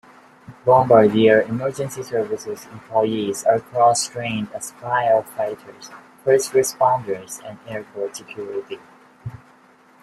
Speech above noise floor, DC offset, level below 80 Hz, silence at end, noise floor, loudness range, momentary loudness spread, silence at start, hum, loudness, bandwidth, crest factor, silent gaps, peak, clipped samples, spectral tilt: 32 dB; under 0.1%; -60 dBFS; 0.65 s; -52 dBFS; 5 LU; 21 LU; 0.5 s; none; -20 LUFS; 15 kHz; 20 dB; none; -2 dBFS; under 0.1%; -4.5 dB/octave